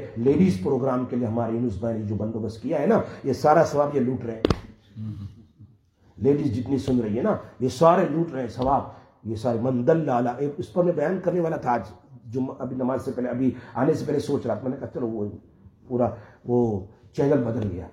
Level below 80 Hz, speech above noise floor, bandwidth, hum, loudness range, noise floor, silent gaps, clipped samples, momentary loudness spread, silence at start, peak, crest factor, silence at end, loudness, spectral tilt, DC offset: -50 dBFS; 34 dB; 12.5 kHz; none; 4 LU; -58 dBFS; none; under 0.1%; 12 LU; 0 s; -2 dBFS; 22 dB; 0 s; -24 LUFS; -8 dB/octave; under 0.1%